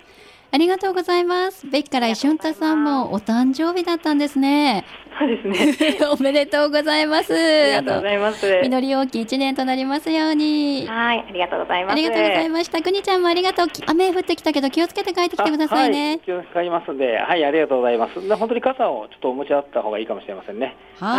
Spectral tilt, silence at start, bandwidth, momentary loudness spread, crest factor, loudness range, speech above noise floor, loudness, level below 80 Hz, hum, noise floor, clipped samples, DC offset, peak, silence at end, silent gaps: -4 dB/octave; 0.5 s; 15 kHz; 7 LU; 14 dB; 3 LU; 28 dB; -19 LUFS; -58 dBFS; none; -47 dBFS; under 0.1%; under 0.1%; -6 dBFS; 0 s; none